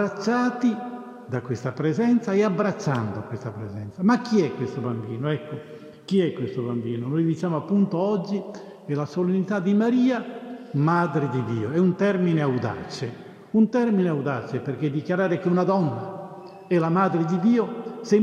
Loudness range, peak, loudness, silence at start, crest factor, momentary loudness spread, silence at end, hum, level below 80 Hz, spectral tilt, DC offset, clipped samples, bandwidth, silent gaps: 3 LU; -8 dBFS; -24 LUFS; 0 s; 16 dB; 13 LU; 0 s; none; -70 dBFS; -8 dB/octave; under 0.1%; under 0.1%; 9.4 kHz; none